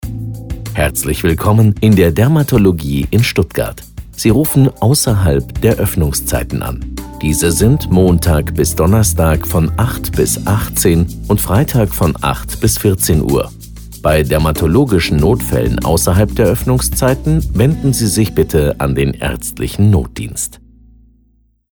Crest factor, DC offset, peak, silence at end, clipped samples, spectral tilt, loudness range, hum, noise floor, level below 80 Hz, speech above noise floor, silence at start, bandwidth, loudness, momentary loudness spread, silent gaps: 12 dB; under 0.1%; 0 dBFS; 1.15 s; under 0.1%; -5.5 dB/octave; 2 LU; none; -54 dBFS; -24 dBFS; 42 dB; 0.05 s; over 20 kHz; -13 LUFS; 9 LU; none